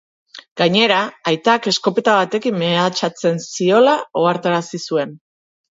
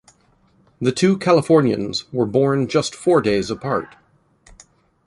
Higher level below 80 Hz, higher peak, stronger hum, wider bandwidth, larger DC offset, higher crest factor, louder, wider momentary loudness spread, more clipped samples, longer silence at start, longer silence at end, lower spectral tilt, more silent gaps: second, -68 dBFS vs -52 dBFS; about the same, -2 dBFS vs -2 dBFS; neither; second, 8 kHz vs 11.5 kHz; neither; about the same, 16 dB vs 16 dB; about the same, -17 LUFS vs -19 LUFS; about the same, 8 LU vs 9 LU; neither; second, 0.35 s vs 0.8 s; second, 0.6 s vs 1.2 s; second, -4.5 dB/octave vs -6 dB/octave; first, 0.51-0.56 s vs none